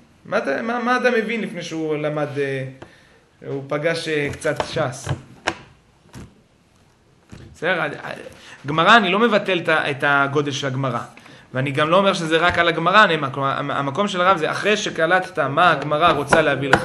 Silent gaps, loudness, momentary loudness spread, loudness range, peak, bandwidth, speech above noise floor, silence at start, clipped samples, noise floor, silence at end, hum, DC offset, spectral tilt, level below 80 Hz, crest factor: none; -19 LUFS; 14 LU; 11 LU; 0 dBFS; 12.5 kHz; 36 dB; 0.25 s; under 0.1%; -56 dBFS; 0 s; none; under 0.1%; -4.5 dB/octave; -52 dBFS; 20 dB